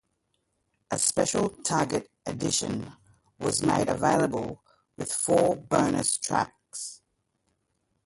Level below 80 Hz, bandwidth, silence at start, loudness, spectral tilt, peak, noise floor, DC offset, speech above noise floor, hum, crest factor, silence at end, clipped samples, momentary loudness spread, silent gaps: -58 dBFS; 12 kHz; 0.9 s; -27 LUFS; -4 dB/octave; -10 dBFS; -76 dBFS; under 0.1%; 50 dB; none; 20 dB; 1.1 s; under 0.1%; 14 LU; none